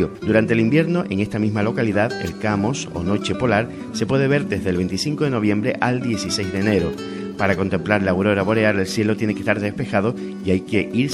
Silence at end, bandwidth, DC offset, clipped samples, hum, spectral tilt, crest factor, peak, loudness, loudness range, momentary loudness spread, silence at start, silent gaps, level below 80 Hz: 0 s; 12.5 kHz; under 0.1%; under 0.1%; none; -6 dB/octave; 18 dB; -2 dBFS; -20 LUFS; 1 LU; 5 LU; 0 s; none; -48 dBFS